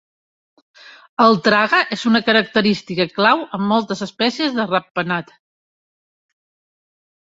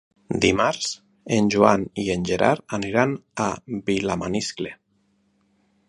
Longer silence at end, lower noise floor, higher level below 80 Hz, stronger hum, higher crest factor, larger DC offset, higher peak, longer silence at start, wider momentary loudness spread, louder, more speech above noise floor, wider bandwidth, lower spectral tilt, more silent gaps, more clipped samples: first, 2.15 s vs 1.15 s; first, under -90 dBFS vs -66 dBFS; second, -62 dBFS vs -50 dBFS; neither; about the same, 18 dB vs 22 dB; neither; about the same, -2 dBFS vs 0 dBFS; first, 0.85 s vs 0.3 s; second, 8 LU vs 11 LU; first, -17 LUFS vs -23 LUFS; first, over 73 dB vs 44 dB; second, 7.8 kHz vs 11.5 kHz; about the same, -5 dB/octave vs -5 dB/octave; first, 1.09-1.17 s, 4.91-4.95 s vs none; neither